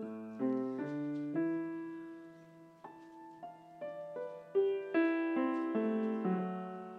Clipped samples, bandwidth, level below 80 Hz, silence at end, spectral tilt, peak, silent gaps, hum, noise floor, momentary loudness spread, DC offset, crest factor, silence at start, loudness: under 0.1%; 5.4 kHz; -88 dBFS; 0 s; -9 dB/octave; -20 dBFS; none; none; -57 dBFS; 20 LU; under 0.1%; 16 dB; 0 s; -36 LUFS